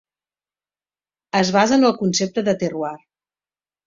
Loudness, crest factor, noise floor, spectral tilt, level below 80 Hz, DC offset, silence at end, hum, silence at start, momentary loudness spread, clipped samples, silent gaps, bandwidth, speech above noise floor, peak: -19 LUFS; 20 dB; under -90 dBFS; -4.5 dB/octave; -62 dBFS; under 0.1%; 0.9 s; 50 Hz at -40 dBFS; 1.35 s; 10 LU; under 0.1%; none; 7.8 kHz; over 72 dB; -2 dBFS